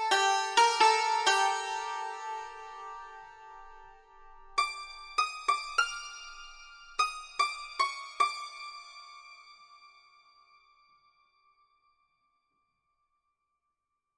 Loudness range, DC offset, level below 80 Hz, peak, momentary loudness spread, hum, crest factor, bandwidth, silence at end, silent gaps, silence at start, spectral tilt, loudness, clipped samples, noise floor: 10 LU; under 0.1%; -64 dBFS; -10 dBFS; 24 LU; none; 24 dB; 11 kHz; 4.55 s; none; 0 s; 1.5 dB/octave; -29 LUFS; under 0.1%; -84 dBFS